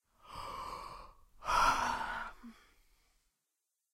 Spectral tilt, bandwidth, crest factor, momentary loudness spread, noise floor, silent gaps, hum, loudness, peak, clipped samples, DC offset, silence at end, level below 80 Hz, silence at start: -2 dB/octave; 16 kHz; 22 dB; 23 LU; -87 dBFS; none; none; -35 LUFS; -18 dBFS; under 0.1%; under 0.1%; 1.4 s; -54 dBFS; 0.25 s